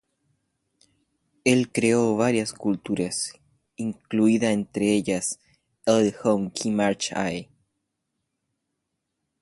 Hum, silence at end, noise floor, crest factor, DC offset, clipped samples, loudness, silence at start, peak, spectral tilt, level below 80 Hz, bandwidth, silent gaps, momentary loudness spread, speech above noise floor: none; 1.95 s; -80 dBFS; 20 dB; under 0.1%; under 0.1%; -24 LUFS; 1.45 s; -6 dBFS; -4.5 dB/octave; -62 dBFS; 11.5 kHz; none; 9 LU; 57 dB